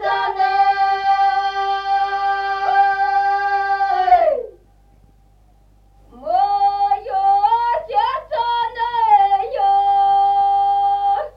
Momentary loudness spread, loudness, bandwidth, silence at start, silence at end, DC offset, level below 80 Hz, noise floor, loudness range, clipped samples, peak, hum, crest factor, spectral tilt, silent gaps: 6 LU; -17 LUFS; 6.2 kHz; 0 s; 0.05 s; under 0.1%; -50 dBFS; -51 dBFS; 4 LU; under 0.1%; -2 dBFS; 50 Hz at -50 dBFS; 14 dB; -3.5 dB/octave; none